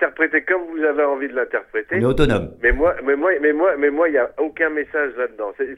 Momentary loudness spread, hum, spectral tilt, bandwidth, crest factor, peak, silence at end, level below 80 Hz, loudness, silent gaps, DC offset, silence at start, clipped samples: 6 LU; none; -7.5 dB/octave; 11.5 kHz; 18 dB; 0 dBFS; 0 s; -34 dBFS; -19 LUFS; none; under 0.1%; 0 s; under 0.1%